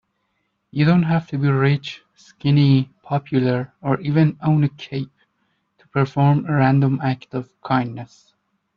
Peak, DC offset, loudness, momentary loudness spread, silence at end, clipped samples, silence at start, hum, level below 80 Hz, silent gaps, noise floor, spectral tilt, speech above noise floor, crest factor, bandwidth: -4 dBFS; under 0.1%; -20 LUFS; 14 LU; 0.7 s; under 0.1%; 0.75 s; none; -58 dBFS; none; -71 dBFS; -9 dB/octave; 52 dB; 16 dB; 6.6 kHz